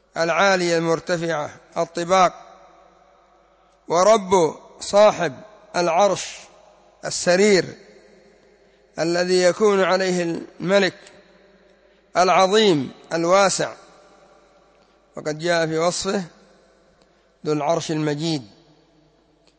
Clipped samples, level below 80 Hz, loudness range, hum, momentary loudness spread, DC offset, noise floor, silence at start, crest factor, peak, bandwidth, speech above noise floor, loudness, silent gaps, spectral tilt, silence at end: under 0.1%; -62 dBFS; 6 LU; none; 13 LU; under 0.1%; -58 dBFS; 0.15 s; 16 dB; -4 dBFS; 8 kHz; 39 dB; -20 LUFS; none; -4 dB/octave; 1.15 s